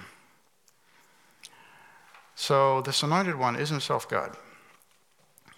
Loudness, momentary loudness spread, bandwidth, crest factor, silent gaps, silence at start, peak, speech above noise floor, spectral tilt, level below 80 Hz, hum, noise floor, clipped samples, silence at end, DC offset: -27 LUFS; 25 LU; 17 kHz; 22 dB; none; 0 s; -10 dBFS; 40 dB; -4.5 dB/octave; -78 dBFS; none; -66 dBFS; under 0.1%; 1.15 s; under 0.1%